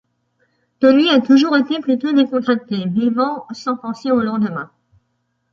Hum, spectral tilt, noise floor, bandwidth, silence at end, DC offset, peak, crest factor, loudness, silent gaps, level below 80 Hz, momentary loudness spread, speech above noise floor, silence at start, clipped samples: none; -6.5 dB/octave; -69 dBFS; 7.2 kHz; 0.85 s; under 0.1%; -2 dBFS; 16 dB; -16 LUFS; none; -64 dBFS; 11 LU; 53 dB; 0.8 s; under 0.1%